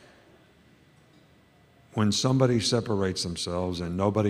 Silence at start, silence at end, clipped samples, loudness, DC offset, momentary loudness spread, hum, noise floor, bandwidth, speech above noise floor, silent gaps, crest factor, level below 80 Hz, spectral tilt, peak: 1.95 s; 0 s; under 0.1%; -26 LUFS; under 0.1%; 7 LU; none; -59 dBFS; 13.5 kHz; 33 dB; none; 20 dB; -56 dBFS; -5 dB/octave; -8 dBFS